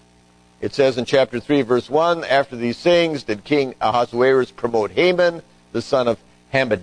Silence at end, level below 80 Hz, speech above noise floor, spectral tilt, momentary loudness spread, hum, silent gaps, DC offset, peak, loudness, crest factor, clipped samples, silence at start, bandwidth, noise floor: 0 s; -54 dBFS; 35 dB; -5.5 dB/octave; 9 LU; none; none; under 0.1%; -2 dBFS; -19 LUFS; 16 dB; under 0.1%; 0.6 s; 10.5 kHz; -53 dBFS